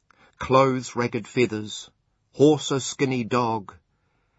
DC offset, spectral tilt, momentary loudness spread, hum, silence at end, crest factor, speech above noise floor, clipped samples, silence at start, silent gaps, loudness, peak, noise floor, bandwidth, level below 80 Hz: under 0.1%; -5.5 dB/octave; 12 LU; none; 0.75 s; 20 dB; 47 dB; under 0.1%; 0.4 s; none; -23 LUFS; -4 dBFS; -69 dBFS; 8 kHz; -58 dBFS